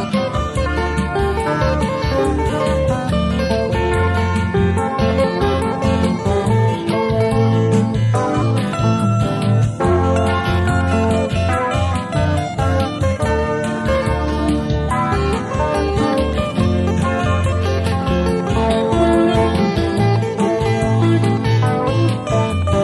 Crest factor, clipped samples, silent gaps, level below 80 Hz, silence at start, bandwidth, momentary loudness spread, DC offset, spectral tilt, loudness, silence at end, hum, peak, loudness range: 14 dB; under 0.1%; none; -28 dBFS; 0 s; 12 kHz; 3 LU; under 0.1%; -7 dB/octave; -17 LUFS; 0 s; none; -2 dBFS; 2 LU